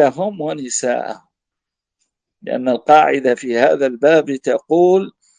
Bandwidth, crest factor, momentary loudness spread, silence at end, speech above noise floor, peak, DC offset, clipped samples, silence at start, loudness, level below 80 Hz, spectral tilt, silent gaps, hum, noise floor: 10 kHz; 16 dB; 13 LU; 0.3 s; 68 dB; 0 dBFS; under 0.1%; under 0.1%; 0 s; -16 LUFS; -66 dBFS; -4.5 dB/octave; none; none; -83 dBFS